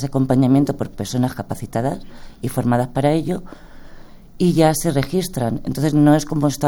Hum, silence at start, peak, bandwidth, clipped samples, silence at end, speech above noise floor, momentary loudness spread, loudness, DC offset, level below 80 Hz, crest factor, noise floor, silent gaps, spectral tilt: none; 0 s; -2 dBFS; 18 kHz; under 0.1%; 0 s; 20 dB; 11 LU; -19 LUFS; under 0.1%; -40 dBFS; 18 dB; -38 dBFS; none; -6.5 dB/octave